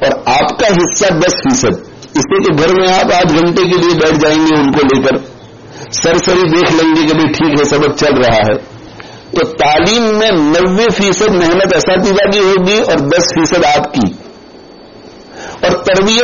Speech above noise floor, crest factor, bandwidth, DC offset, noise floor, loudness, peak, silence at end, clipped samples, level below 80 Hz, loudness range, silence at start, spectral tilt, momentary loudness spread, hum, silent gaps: 25 dB; 10 dB; 7.4 kHz; under 0.1%; -35 dBFS; -10 LUFS; 0 dBFS; 0 s; under 0.1%; -36 dBFS; 2 LU; 0 s; -3.5 dB/octave; 7 LU; none; none